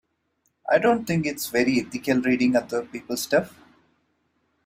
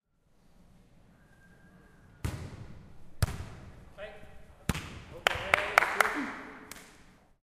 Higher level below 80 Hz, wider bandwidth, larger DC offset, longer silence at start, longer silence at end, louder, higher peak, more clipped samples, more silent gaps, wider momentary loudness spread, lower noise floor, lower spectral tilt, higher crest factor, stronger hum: second, -62 dBFS vs -50 dBFS; about the same, 16 kHz vs 15.5 kHz; neither; second, 0.65 s vs 1.5 s; first, 1.15 s vs 0.4 s; first, -23 LUFS vs -31 LUFS; about the same, -6 dBFS vs -4 dBFS; neither; neither; second, 10 LU vs 24 LU; first, -72 dBFS vs -65 dBFS; about the same, -5 dB/octave vs -4 dB/octave; second, 20 dB vs 32 dB; neither